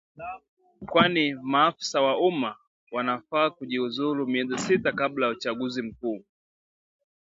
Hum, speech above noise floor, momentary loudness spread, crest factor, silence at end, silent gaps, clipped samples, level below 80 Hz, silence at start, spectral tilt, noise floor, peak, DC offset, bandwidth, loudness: none; over 64 dB; 13 LU; 22 dB; 1.15 s; 0.49-0.57 s, 2.67-2.87 s; under 0.1%; -64 dBFS; 0.2 s; -4.5 dB/octave; under -90 dBFS; -4 dBFS; under 0.1%; 8 kHz; -26 LUFS